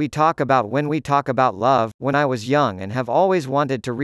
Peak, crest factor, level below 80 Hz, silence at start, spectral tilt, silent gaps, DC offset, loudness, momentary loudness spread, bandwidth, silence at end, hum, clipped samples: -4 dBFS; 16 dB; -58 dBFS; 0 s; -6.5 dB/octave; 1.94-1.99 s; under 0.1%; -19 LUFS; 4 LU; 12 kHz; 0 s; none; under 0.1%